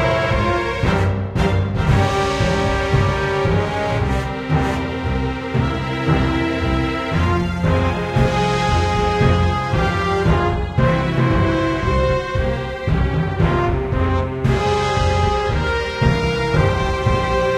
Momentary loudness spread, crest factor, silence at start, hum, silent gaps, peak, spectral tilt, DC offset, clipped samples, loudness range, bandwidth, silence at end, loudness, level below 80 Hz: 4 LU; 16 dB; 0 s; none; none; -2 dBFS; -6.5 dB/octave; under 0.1%; under 0.1%; 2 LU; 11.5 kHz; 0 s; -18 LUFS; -26 dBFS